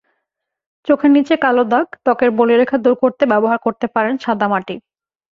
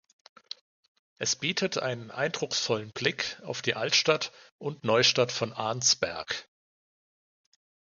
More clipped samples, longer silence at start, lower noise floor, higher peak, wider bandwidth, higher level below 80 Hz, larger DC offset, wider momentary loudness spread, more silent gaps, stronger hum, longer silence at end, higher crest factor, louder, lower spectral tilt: neither; second, 0.85 s vs 1.2 s; second, -77 dBFS vs under -90 dBFS; first, -2 dBFS vs -8 dBFS; second, 7 kHz vs 10.5 kHz; first, -60 dBFS vs -70 dBFS; neither; second, 6 LU vs 14 LU; second, none vs 4.52-4.59 s; neither; second, 0.55 s vs 1.55 s; second, 14 dB vs 24 dB; first, -15 LUFS vs -28 LUFS; first, -7 dB/octave vs -2 dB/octave